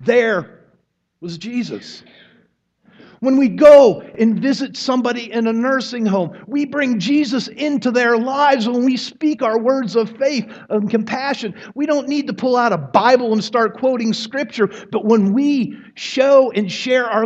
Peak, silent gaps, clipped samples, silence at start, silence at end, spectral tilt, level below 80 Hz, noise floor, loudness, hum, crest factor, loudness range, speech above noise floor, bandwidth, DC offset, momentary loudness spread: 0 dBFS; none; under 0.1%; 0 s; 0 s; -5.5 dB/octave; -62 dBFS; -63 dBFS; -16 LUFS; none; 16 dB; 5 LU; 47 dB; 8.2 kHz; under 0.1%; 11 LU